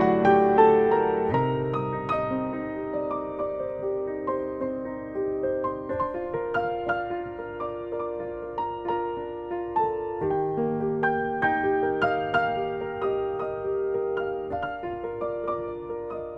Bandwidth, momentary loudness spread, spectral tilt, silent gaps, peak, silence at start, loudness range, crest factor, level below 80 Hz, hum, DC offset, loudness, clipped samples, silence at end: 5.8 kHz; 10 LU; -8.5 dB/octave; none; -6 dBFS; 0 s; 5 LU; 20 dB; -54 dBFS; none; under 0.1%; -27 LUFS; under 0.1%; 0 s